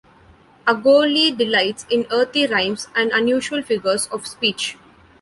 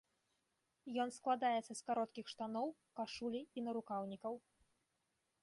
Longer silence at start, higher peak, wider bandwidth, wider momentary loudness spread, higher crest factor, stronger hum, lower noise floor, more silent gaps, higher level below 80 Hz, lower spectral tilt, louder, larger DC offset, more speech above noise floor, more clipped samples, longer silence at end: second, 0.65 s vs 0.85 s; first, -2 dBFS vs -26 dBFS; about the same, 11.5 kHz vs 11.5 kHz; about the same, 8 LU vs 10 LU; about the same, 16 dB vs 20 dB; neither; second, -50 dBFS vs -86 dBFS; neither; first, -60 dBFS vs -84 dBFS; second, -2.5 dB/octave vs -4.5 dB/octave; first, -18 LUFS vs -43 LUFS; neither; second, 31 dB vs 43 dB; neither; second, 0.5 s vs 1.05 s